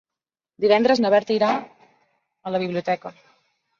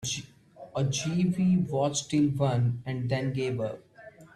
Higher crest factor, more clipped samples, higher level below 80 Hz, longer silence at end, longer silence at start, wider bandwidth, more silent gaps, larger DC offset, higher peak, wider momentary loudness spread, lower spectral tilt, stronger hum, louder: about the same, 18 dB vs 16 dB; neither; second, -68 dBFS vs -60 dBFS; first, 0.7 s vs 0.1 s; first, 0.6 s vs 0 s; second, 7.4 kHz vs 12.5 kHz; neither; neither; first, -4 dBFS vs -14 dBFS; about the same, 11 LU vs 9 LU; about the same, -5.5 dB/octave vs -5.5 dB/octave; neither; first, -21 LUFS vs -28 LUFS